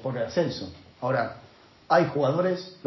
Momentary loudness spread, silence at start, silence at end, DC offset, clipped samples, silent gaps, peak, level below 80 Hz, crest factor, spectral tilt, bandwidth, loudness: 14 LU; 0 s; 0.1 s; under 0.1%; under 0.1%; none; -8 dBFS; -60 dBFS; 20 dB; -6.5 dB/octave; 6.2 kHz; -26 LUFS